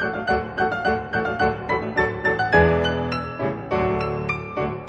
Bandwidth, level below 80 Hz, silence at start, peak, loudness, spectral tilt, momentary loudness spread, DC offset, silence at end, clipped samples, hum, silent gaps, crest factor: 8.4 kHz; -40 dBFS; 0 s; -4 dBFS; -22 LUFS; -7 dB/octave; 9 LU; under 0.1%; 0 s; under 0.1%; none; none; 18 dB